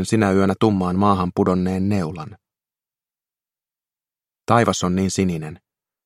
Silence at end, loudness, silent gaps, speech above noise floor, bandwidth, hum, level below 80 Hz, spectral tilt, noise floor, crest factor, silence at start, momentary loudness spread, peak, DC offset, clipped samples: 0.5 s; -19 LUFS; none; over 71 dB; 12.5 kHz; none; -54 dBFS; -6 dB/octave; under -90 dBFS; 20 dB; 0 s; 14 LU; 0 dBFS; under 0.1%; under 0.1%